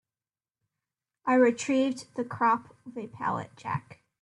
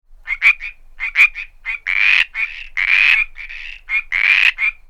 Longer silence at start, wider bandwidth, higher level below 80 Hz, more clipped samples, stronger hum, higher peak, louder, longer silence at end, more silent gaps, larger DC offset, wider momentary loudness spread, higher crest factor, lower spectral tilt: first, 1.25 s vs 0.1 s; second, 11 kHz vs 14 kHz; second, -74 dBFS vs -40 dBFS; neither; neither; second, -10 dBFS vs 0 dBFS; second, -28 LUFS vs -14 LUFS; first, 0.4 s vs 0.15 s; neither; neither; about the same, 14 LU vs 16 LU; about the same, 20 dB vs 18 dB; first, -5.5 dB/octave vs 2 dB/octave